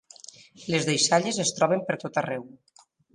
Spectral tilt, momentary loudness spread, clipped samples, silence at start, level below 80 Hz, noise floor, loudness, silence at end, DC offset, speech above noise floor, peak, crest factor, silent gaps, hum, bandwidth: -3 dB/octave; 22 LU; under 0.1%; 0.6 s; -70 dBFS; -49 dBFS; -25 LUFS; 0.65 s; under 0.1%; 23 dB; -8 dBFS; 20 dB; none; none; 11.5 kHz